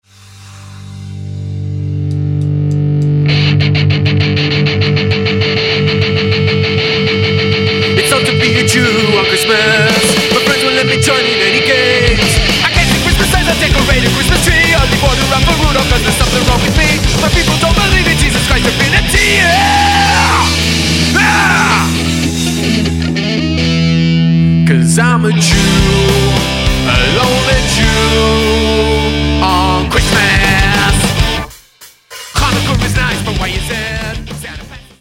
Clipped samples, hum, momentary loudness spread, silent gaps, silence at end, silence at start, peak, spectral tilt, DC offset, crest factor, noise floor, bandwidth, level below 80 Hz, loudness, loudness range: under 0.1%; none; 7 LU; none; 0.2 s; 0.3 s; 0 dBFS; -4 dB/octave; under 0.1%; 10 dB; -40 dBFS; 16.5 kHz; -20 dBFS; -10 LUFS; 4 LU